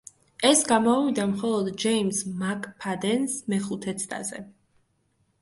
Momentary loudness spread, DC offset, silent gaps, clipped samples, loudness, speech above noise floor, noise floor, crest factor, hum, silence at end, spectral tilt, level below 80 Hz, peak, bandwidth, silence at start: 12 LU; under 0.1%; none; under 0.1%; -25 LUFS; 45 dB; -70 dBFS; 20 dB; none; 0.9 s; -3.5 dB/octave; -66 dBFS; -6 dBFS; 12 kHz; 0.4 s